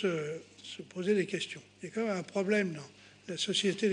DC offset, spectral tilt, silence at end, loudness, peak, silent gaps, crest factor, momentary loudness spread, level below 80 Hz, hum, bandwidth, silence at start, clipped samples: under 0.1%; -4.5 dB/octave; 0 s; -33 LUFS; -16 dBFS; none; 16 dB; 16 LU; -80 dBFS; none; 10 kHz; 0 s; under 0.1%